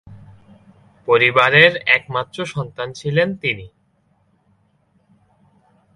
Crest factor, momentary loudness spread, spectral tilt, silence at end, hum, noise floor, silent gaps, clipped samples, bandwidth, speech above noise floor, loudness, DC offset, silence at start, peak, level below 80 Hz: 20 dB; 16 LU; -5 dB/octave; 2.3 s; none; -61 dBFS; none; under 0.1%; 11.5 kHz; 44 dB; -16 LUFS; under 0.1%; 0.1 s; 0 dBFS; -56 dBFS